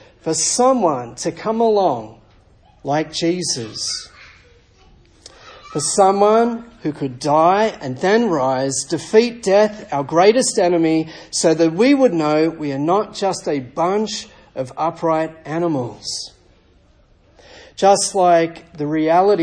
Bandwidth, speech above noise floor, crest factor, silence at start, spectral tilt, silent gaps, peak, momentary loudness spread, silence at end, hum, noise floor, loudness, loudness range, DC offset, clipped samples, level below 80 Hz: 10.5 kHz; 36 dB; 18 dB; 0.25 s; -4 dB/octave; none; 0 dBFS; 12 LU; 0 s; none; -53 dBFS; -17 LUFS; 8 LU; under 0.1%; under 0.1%; -54 dBFS